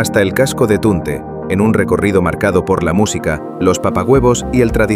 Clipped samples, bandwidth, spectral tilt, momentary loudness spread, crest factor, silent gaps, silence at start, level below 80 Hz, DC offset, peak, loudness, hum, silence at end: under 0.1%; 16 kHz; -6 dB/octave; 7 LU; 12 dB; none; 0 s; -30 dBFS; under 0.1%; 0 dBFS; -14 LUFS; none; 0 s